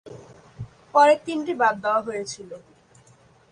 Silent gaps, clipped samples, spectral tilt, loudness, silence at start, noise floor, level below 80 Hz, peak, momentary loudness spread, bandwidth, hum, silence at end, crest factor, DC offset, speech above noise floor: none; under 0.1%; -4.5 dB/octave; -21 LUFS; 0.05 s; -55 dBFS; -60 dBFS; -4 dBFS; 24 LU; 10.5 kHz; none; 0.95 s; 20 dB; under 0.1%; 34 dB